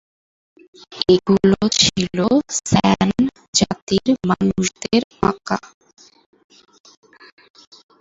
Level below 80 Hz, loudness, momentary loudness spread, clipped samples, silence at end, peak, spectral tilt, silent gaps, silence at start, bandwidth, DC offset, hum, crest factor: -46 dBFS; -18 LUFS; 7 LU; under 0.1%; 2.4 s; 0 dBFS; -4.5 dB/octave; 3.48-3.53 s, 3.82-3.87 s, 5.04-5.10 s; 0.9 s; 8 kHz; under 0.1%; none; 20 dB